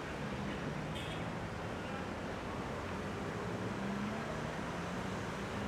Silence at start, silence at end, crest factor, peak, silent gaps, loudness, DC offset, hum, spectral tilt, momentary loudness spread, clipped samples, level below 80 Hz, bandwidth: 0 s; 0 s; 14 dB; -26 dBFS; none; -41 LUFS; under 0.1%; none; -5.5 dB/octave; 2 LU; under 0.1%; -54 dBFS; 16 kHz